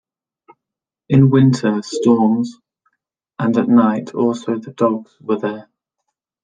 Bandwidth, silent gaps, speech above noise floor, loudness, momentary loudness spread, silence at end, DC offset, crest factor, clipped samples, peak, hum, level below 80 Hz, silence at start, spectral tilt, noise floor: 9.4 kHz; none; 70 dB; -16 LUFS; 12 LU; 0.8 s; under 0.1%; 16 dB; under 0.1%; -2 dBFS; none; -60 dBFS; 1.1 s; -8 dB/octave; -85 dBFS